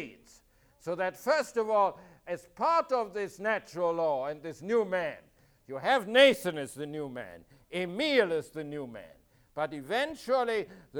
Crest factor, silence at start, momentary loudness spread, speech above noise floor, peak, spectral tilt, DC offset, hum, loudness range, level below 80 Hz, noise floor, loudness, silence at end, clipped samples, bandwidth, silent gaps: 22 dB; 0 s; 16 LU; 33 dB; -8 dBFS; -4 dB/octave; under 0.1%; none; 5 LU; -68 dBFS; -63 dBFS; -30 LUFS; 0 s; under 0.1%; over 20 kHz; none